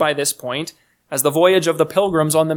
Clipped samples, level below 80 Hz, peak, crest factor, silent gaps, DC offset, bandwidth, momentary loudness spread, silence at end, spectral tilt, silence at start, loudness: under 0.1%; -58 dBFS; -2 dBFS; 16 dB; none; under 0.1%; 19 kHz; 11 LU; 0 s; -4 dB/octave; 0 s; -17 LUFS